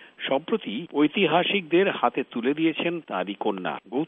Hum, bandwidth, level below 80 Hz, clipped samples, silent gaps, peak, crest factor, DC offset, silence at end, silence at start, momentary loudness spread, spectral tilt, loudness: none; 3.9 kHz; -78 dBFS; under 0.1%; none; -6 dBFS; 18 dB; under 0.1%; 0 s; 0 s; 9 LU; -3 dB/octave; -25 LUFS